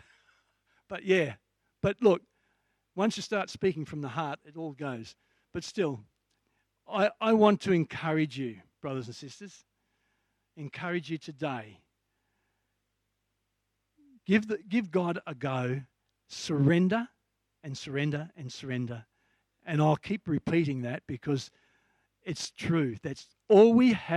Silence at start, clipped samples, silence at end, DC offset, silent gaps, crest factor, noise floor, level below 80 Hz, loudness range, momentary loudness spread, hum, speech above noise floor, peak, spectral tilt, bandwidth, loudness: 0.9 s; under 0.1%; 0 s; under 0.1%; none; 22 dB; -81 dBFS; -68 dBFS; 11 LU; 19 LU; none; 52 dB; -8 dBFS; -6.5 dB/octave; 11.5 kHz; -29 LUFS